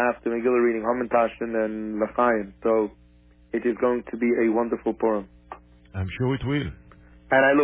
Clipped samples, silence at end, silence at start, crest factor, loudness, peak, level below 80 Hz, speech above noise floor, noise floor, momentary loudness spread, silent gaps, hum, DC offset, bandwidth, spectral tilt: under 0.1%; 0 s; 0 s; 18 dB; -24 LUFS; -8 dBFS; -48 dBFS; 31 dB; -54 dBFS; 11 LU; none; 60 Hz at -55 dBFS; under 0.1%; 3.8 kHz; -10.5 dB/octave